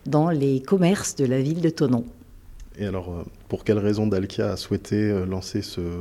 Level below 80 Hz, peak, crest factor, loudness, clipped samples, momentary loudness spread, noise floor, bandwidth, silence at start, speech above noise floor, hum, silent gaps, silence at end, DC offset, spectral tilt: -48 dBFS; -8 dBFS; 16 dB; -24 LUFS; under 0.1%; 11 LU; -43 dBFS; 15.5 kHz; 0.05 s; 20 dB; none; none; 0 s; under 0.1%; -6.5 dB/octave